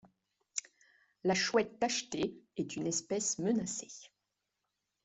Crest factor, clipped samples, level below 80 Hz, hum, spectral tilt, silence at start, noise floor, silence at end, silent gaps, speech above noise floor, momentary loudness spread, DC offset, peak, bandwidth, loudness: 22 dB; under 0.1%; -72 dBFS; 50 Hz at -70 dBFS; -3 dB/octave; 0.55 s; -86 dBFS; 1 s; none; 51 dB; 10 LU; under 0.1%; -16 dBFS; 8.2 kHz; -35 LUFS